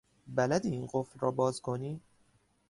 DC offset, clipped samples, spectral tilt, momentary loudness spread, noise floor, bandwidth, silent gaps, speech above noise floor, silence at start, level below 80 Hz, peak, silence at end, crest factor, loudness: under 0.1%; under 0.1%; -6 dB/octave; 8 LU; -70 dBFS; 11.5 kHz; none; 37 dB; 0.25 s; -66 dBFS; -16 dBFS; 0.7 s; 18 dB; -33 LUFS